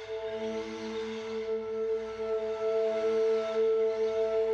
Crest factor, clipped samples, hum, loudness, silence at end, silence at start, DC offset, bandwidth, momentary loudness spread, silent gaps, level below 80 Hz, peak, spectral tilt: 10 dB; under 0.1%; none; -31 LUFS; 0 s; 0 s; under 0.1%; 7.4 kHz; 8 LU; none; -64 dBFS; -20 dBFS; -4.5 dB/octave